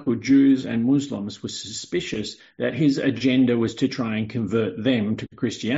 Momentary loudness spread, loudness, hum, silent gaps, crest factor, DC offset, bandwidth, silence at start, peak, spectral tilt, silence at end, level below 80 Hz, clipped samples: 12 LU; -23 LUFS; none; none; 14 dB; under 0.1%; 8 kHz; 0 s; -8 dBFS; -5.5 dB/octave; 0 s; -58 dBFS; under 0.1%